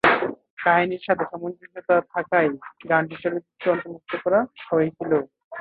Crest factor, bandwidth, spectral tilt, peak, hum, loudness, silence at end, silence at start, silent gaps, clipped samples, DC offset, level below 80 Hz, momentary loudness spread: 20 dB; 5 kHz; -8 dB/octave; -2 dBFS; none; -23 LUFS; 0 s; 0.05 s; 0.50-0.57 s, 5.44-5.51 s; under 0.1%; under 0.1%; -64 dBFS; 11 LU